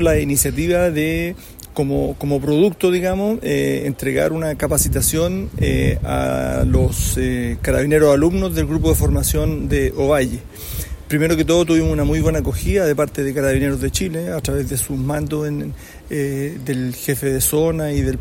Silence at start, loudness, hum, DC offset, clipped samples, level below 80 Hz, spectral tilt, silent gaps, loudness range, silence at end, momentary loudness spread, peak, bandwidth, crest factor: 0 s; -18 LUFS; none; under 0.1%; under 0.1%; -28 dBFS; -5.5 dB/octave; none; 4 LU; 0 s; 8 LU; -2 dBFS; 16.5 kHz; 16 dB